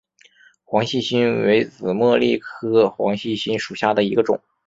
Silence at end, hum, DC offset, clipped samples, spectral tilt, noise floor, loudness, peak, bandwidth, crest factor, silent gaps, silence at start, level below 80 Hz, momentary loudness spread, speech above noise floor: 0.3 s; none; under 0.1%; under 0.1%; -6 dB/octave; -53 dBFS; -20 LUFS; -2 dBFS; 7.8 kHz; 18 dB; none; 0.7 s; -60 dBFS; 7 LU; 34 dB